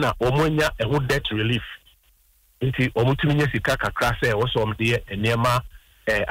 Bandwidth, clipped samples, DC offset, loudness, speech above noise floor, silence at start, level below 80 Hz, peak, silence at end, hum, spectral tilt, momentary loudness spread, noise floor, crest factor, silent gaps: 16 kHz; under 0.1%; under 0.1%; -22 LUFS; 38 dB; 0 s; -40 dBFS; -10 dBFS; 0 s; none; -6 dB/octave; 5 LU; -60 dBFS; 14 dB; none